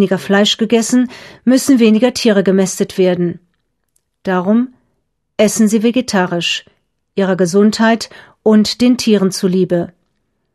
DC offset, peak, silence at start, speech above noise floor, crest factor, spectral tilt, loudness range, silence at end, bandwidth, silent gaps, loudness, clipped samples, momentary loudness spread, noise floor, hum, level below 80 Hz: under 0.1%; 0 dBFS; 0 s; 55 dB; 14 dB; -5 dB/octave; 4 LU; 0.7 s; 13 kHz; none; -13 LUFS; under 0.1%; 10 LU; -68 dBFS; none; -56 dBFS